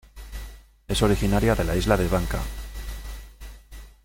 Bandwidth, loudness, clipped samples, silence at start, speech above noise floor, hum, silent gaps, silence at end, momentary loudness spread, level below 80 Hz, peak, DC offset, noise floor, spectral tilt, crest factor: 17 kHz; -24 LUFS; under 0.1%; 0.15 s; 22 dB; none; none; 0.15 s; 23 LU; -32 dBFS; -4 dBFS; under 0.1%; -44 dBFS; -5.5 dB/octave; 20 dB